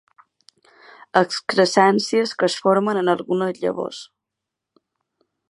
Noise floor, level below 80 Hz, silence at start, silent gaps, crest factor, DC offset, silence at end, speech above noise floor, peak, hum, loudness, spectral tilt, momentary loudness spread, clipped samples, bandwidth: -83 dBFS; -72 dBFS; 1.15 s; none; 22 dB; under 0.1%; 1.45 s; 64 dB; 0 dBFS; none; -20 LUFS; -4.5 dB/octave; 9 LU; under 0.1%; 11.5 kHz